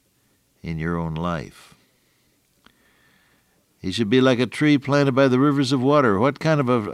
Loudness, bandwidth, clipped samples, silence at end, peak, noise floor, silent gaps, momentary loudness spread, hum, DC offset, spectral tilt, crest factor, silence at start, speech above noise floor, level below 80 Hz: -20 LUFS; 12 kHz; under 0.1%; 0 s; -4 dBFS; -64 dBFS; none; 13 LU; none; under 0.1%; -6.5 dB/octave; 16 dB; 0.65 s; 45 dB; -54 dBFS